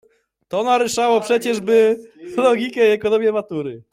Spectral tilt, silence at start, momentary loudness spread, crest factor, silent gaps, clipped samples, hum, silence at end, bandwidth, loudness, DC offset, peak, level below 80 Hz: -4 dB/octave; 0.5 s; 11 LU; 14 dB; none; under 0.1%; none; 0.15 s; 15.5 kHz; -18 LUFS; under 0.1%; -4 dBFS; -62 dBFS